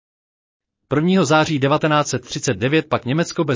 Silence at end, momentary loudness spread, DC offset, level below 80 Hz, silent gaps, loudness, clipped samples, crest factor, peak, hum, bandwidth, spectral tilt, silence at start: 0 s; 7 LU; under 0.1%; -52 dBFS; none; -18 LUFS; under 0.1%; 14 dB; -4 dBFS; none; 7.6 kHz; -5.5 dB/octave; 0.9 s